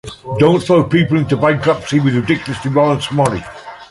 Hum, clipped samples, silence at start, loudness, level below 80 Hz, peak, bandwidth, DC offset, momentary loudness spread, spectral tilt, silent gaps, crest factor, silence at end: none; under 0.1%; 0.05 s; -14 LUFS; -44 dBFS; -2 dBFS; 11.5 kHz; under 0.1%; 9 LU; -6.5 dB/octave; none; 14 dB; 0.05 s